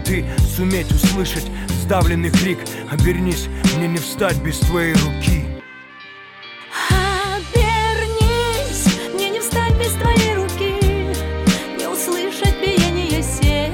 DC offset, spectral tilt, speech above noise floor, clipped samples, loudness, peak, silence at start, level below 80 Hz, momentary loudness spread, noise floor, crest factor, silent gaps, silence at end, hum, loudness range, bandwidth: under 0.1%; -5 dB/octave; 21 dB; under 0.1%; -18 LUFS; -4 dBFS; 0 s; -24 dBFS; 8 LU; -38 dBFS; 14 dB; none; 0 s; none; 2 LU; 19 kHz